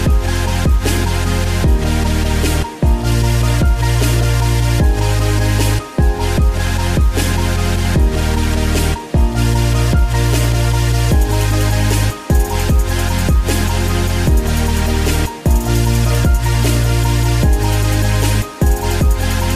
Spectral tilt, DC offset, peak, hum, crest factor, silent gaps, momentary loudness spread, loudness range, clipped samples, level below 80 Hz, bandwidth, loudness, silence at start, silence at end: -5.5 dB/octave; 0.3%; -2 dBFS; none; 12 dB; none; 2 LU; 1 LU; under 0.1%; -16 dBFS; 16 kHz; -15 LUFS; 0 s; 0 s